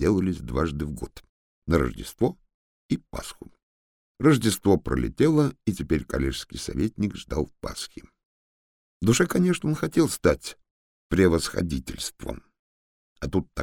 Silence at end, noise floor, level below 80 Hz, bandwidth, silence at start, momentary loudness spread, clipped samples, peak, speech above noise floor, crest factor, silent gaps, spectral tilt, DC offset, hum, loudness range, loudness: 0 s; under -90 dBFS; -40 dBFS; 19 kHz; 0 s; 16 LU; under 0.1%; -6 dBFS; over 65 dB; 20 dB; 1.29-1.62 s, 2.54-2.89 s, 3.63-4.15 s, 8.25-9.00 s, 10.71-11.10 s, 12.59-13.16 s; -5.5 dB/octave; under 0.1%; none; 6 LU; -25 LUFS